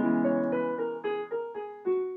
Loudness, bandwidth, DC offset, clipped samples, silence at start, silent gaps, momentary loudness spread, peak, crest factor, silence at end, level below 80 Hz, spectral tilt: -30 LUFS; 4 kHz; under 0.1%; under 0.1%; 0 s; none; 9 LU; -16 dBFS; 14 dB; 0 s; -80 dBFS; -10 dB/octave